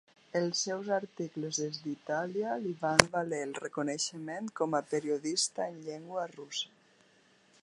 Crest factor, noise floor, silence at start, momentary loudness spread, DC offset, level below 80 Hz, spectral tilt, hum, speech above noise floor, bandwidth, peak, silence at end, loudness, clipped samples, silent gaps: 34 dB; -65 dBFS; 0.35 s; 12 LU; under 0.1%; -66 dBFS; -3 dB/octave; none; 32 dB; 11 kHz; 0 dBFS; 0.95 s; -33 LUFS; under 0.1%; none